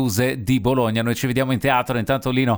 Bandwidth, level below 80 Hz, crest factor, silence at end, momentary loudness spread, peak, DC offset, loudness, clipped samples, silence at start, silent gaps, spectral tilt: over 20 kHz; -44 dBFS; 16 dB; 0 s; 3 LU; -4 dBFS; under 0.1%; -20 LUFS; under 0.1%; 0 s; none; -5.5 dB/octave